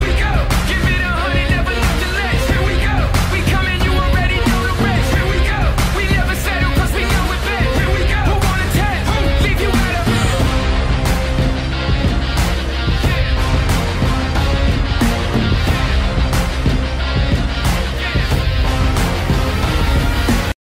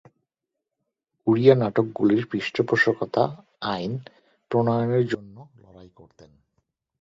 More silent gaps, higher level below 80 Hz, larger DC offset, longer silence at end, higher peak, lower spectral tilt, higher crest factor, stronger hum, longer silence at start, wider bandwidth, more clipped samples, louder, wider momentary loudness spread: neither; first, -18 dBFS vs -62 dBFS; neither; second, 0.1 s vs 1.15 s; about the same, -4 dBFS vs -2 dBFS; second, -5.5 dB/octave vs -7.5 dB/octave; second, 10 dB vs 22 dB; neither; second, 0 s vs 1.25 s; first, 16.5 kHz vs 7.6 kHz; neither; first, -16 LUFS vs -23 LUFS; second, 2 LU vs 12 LU